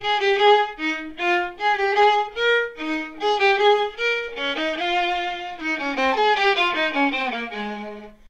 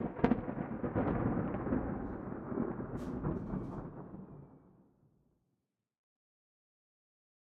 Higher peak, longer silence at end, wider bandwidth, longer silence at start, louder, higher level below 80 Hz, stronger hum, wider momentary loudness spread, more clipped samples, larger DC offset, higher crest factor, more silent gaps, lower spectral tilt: first, -6 dBFS vs -12 dBFS; second, 0.15 s vs 2.8 s; first, 8.8 kHz vs 6.8 kHz; about the same, 0 s vs 0 s; first, -21 LUFS vs -38 LUFS; about the same, -54 dBFS vs -54 dBFS; neither; second, 10 LU vs 15 LU; neither; first, 0.3% vs under 0.1%; second, 16 dB vs 28 dB; neither; second, -3 dB/octave vs -10 dB/octave